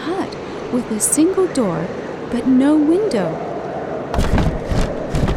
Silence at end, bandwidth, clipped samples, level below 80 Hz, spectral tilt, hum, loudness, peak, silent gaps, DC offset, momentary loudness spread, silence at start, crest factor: 0 s; 17.5 kHz; under 0.1%; -28 dBFS; -5.5 dB/octave; none; -19 LUFS; -2 dBFS; none; under 0.1%; 11 LU; 0 s; 16 dB